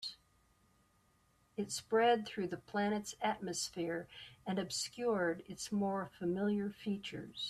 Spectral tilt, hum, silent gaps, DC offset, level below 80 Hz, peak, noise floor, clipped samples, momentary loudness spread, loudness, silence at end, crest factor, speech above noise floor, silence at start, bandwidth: -4 dB/octave; none; none; under 0.1%; -72 dBFS; -20 dBFS; -73 dBFS; under 0.1%; 12 LU; -38 LUFS; 0 s; 18 dB; 36 dB; 0 s; 14 kHz